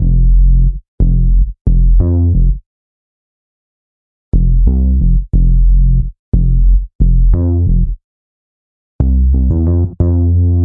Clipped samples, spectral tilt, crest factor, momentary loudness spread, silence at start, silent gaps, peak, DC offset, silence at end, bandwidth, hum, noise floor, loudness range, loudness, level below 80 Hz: under 0.1%; -15.5 dB/octave; 10 dB; 6 LU; 0 s; 0.88-0.98 s, 1.61-1.65 s, 2.66-4.32 s, 6.19-6.32 s, 6.95-6.99 s, 8.04-8.99 s; 0 dBFS; under 0.1%; 0 s; 1.2 kHz; none; under -90 dBFS; 3 LU; -14 LUFS; -12 dBFS